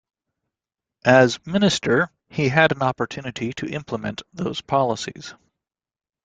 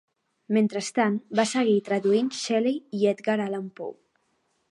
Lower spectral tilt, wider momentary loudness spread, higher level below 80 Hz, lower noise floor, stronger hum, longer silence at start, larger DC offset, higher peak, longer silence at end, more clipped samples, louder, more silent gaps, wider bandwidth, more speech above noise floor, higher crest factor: about the same, -5 dB/octave vs -5 dB/octave; first, 13 LU vs 9 LU; first, -56 dBFS vs -78 dBFS; first, -88 dBFS vs -72 dBFS; neither; first, 1.05 s vs 0.5 s; neither; first, -2 dBFS vs -8 dBFS; about the same, 0.9 s vs 0.8 s; neither; first, -21 LUFS vs -25 LUFS; neither; second, 9.4 kHz vs 11.5 kHz; first, 67 dB vs 47 dB; about the same, 20 dB vs 18 dB